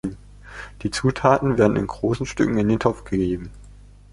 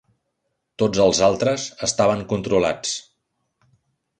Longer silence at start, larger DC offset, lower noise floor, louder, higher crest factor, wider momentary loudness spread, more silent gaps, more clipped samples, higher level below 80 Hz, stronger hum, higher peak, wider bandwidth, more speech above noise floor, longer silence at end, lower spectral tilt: second, 0.05 s vs 0.8 s; neither; second, -45 dBFS vs -75 dBFS; about the same, -21 LUFS vs -20 LUFS; about the same, 22 dB vs 18 dB; first, 19 LU vs 9 LU; neither; neither; first, -42 dBFS vs -50 dBFS; first, 50 Hz at -40 dBFS vs none; about the same, -2 dBFS vs -4 dBFS; first, 11.5 kHz vs 10 kHz; second, 24 dB vs 56 dB; second, 0.4 s vs 1.2 s; first, -6.5 dB/octave vs -4 dB/octave